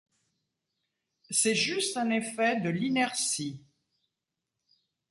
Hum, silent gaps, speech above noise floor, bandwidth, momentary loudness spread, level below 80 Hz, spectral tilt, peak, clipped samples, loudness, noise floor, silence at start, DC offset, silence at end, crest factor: none; none; 58 dB; 12 kHz; 6 LU; -76 dBFS; -3 dB/octave; -12 dBFS; under 0.1%; -28 LUFS; -87 dBFS; 1.3 s; under 0.1%; 1.55 s; 20 dB